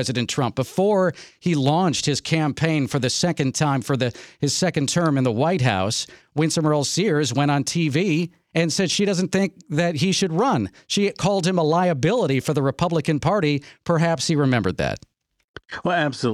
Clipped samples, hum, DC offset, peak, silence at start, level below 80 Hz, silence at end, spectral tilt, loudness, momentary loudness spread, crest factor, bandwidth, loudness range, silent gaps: under 0.1%; none; under 0.1%; -4 dBFS; 0 s; -52 dBFS; 0 s; -5 dB/octave; -21 LUFS; 5 LU; 18 dB; 14.5 kHz; 1 LU; 15.44-15.54 s